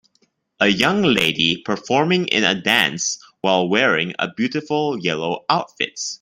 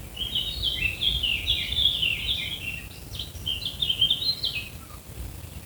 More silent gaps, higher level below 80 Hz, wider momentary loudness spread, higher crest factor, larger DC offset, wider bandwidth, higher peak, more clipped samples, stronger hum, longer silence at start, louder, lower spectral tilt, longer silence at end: neither; second, -58 dBFS vs -42 dBFS; second, 8 LU vs 18 LU; about the same, 20 dB vs 20 dB; neither; second, 16 kHz vs over 20 kHz; first, 0 dBFS vs -8 dBFS; neither; neither; first, 0.6 s vs 0 s; first, -18 LUFS vs -25 LUFS; first, -3.5 dB/octave vs -2 dB/octave; about the same, 0.05 s vs 0 s